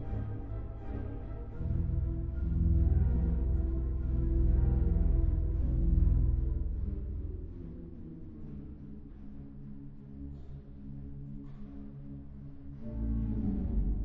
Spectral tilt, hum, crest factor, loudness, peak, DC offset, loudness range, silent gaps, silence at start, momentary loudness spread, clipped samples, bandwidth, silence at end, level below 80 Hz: -12 dB/octave; none; 16 dB; -33 LUFS; -16 dBFS; under 0.1%; 16 LU; none; 0 s; 18 LU; under 0.1%; 2.3 kHz; 0 s; -34 dBFS